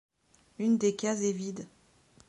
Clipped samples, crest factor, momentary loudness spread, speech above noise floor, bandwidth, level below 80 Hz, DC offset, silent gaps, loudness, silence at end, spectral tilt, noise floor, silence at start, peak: under 0.1%; 16 dB; 16 LU; 36 dB; 11 kHz; -74 dBFS; under 0.1%; none; -30 LUFS; 0.6 s; -5 dB/octave; -66 dBFS; 0.6 s; -16 dBFS